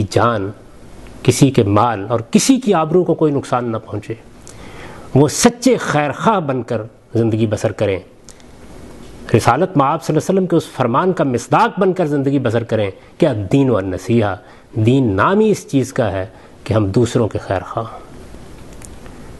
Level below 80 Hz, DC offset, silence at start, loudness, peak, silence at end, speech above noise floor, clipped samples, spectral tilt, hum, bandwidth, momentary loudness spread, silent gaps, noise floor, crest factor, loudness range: -44 dBFS; 0.2%; 0 s; -16 LUFS; 0 dBFS; 0 s; 25 dB; under 0.1%; -6 dB/octave; none; 12.5 kHz; 17 LU; none; -41 dBFS; 16 dB; 4 LU